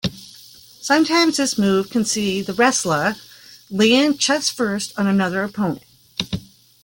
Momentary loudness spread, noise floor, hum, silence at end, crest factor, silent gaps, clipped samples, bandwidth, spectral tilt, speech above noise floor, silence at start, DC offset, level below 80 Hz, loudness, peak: 14 LU; -45 dBFS; none; 0.4 s; 16 dB; none; under 0.1%; 17 kHz; -3.5 dB/octave; 26 dB; 0.05 s; under 0.1%; -54 dBFS; -19 LUFS; -4 dBFS